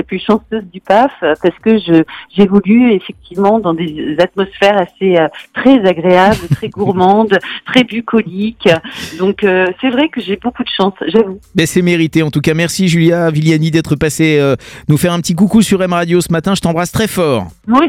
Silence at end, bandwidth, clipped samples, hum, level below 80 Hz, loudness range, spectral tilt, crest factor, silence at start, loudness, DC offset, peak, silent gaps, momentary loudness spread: 0 s; 16.5 kHz; 0.1%; none; -42 dBFS; 2 LU; -6 dB/octave; 12 dB; 0 s; -12 LUFS; under 0.1%; 0 dBFS; none; 7 LU